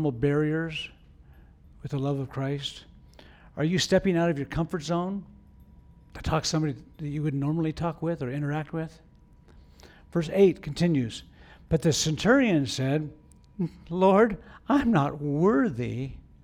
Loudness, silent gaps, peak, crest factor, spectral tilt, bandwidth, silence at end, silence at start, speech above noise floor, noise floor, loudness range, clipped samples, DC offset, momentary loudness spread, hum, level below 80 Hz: -27 LUFS; none; -8 dBFS; 18 dB; -6 dB/octave; 14 kHz; 0.25 s; 0 s; 29 dB; -54 dBFS; 7 LU; under 0.1%; under 0.1%; 14 LU; none; -50 dBFS